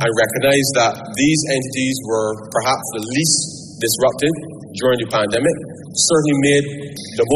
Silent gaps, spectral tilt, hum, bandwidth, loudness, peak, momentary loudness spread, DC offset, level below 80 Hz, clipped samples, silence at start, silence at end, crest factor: none; -3.5 dB/octave; none; 13.5 kHz; -17 LUFS; -2 dBFS; 10 LU; under 0.1%; -52 dBFS; under 0.1%; 0 s; 0 s; 14 dB